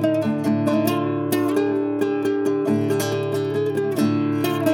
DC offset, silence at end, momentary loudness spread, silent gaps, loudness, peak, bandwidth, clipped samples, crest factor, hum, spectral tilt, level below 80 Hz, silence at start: under 0.1%; 0 s; 2 LU; none; -21 LUFS; -6 dBFS; 18 kHz; under 0.1%; 16 dB; none; -6.5 dB/octave; -68 dBFS; 0 s